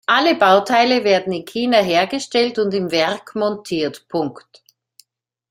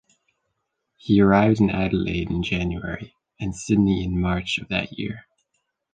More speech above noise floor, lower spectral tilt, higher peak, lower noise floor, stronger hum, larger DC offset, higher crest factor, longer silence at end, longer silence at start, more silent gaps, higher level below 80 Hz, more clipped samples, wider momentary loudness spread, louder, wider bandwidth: second, 50 dB vs 55 dB; second, -4.5 dB/octave vs -6.5 dB/octave; about the same, -2 dBFS vs -4 dBFS; second, -67 dBFS vs -77 dBFS; neither; neither; about the same, 16 dB vs 20 dB; first, 1.1 s vs 0.75 s; second, 0.1 s vs 1.05 s; neither; second, -62 dBFS vs -40 dBFS; neither; second, 10 LU vs 16 LU; first, -17 LUFS vs -22 LUFS; first, 16 kHz vs 9.4 kHz